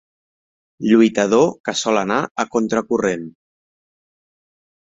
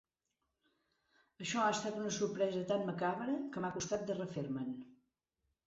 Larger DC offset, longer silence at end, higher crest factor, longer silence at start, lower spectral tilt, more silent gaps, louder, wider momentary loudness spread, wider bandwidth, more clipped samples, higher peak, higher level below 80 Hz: neither; first, 1.55 s vs 0.7 s; about the same, 18 dB vs 16 dB; second, 0.8 s vs 1.4 s; about the same, -4.5 dB/octave vs -4.5 dB/octave; first, 1.60-1.64 s, 2.31-2.35 s vs none; first, -18 LUFS vs -38 LUFS; about the same, 9 LU vs 7 LU; about the same, 7.8 kHz vs 8 kHz; neither; first, -2 dBFS vs -24 dBFS; first, -60 dBFS vs -74 dBFS